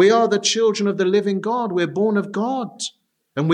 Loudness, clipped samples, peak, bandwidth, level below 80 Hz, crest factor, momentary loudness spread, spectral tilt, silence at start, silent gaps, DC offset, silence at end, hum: -20 LUFS; under 0.1%; -4 dBFS; 10.5 kHz; -76 dBFS; 16 dB; 11 LU; -4.5 dB/octave; 0 s; none; under 0.1%; 0 s; none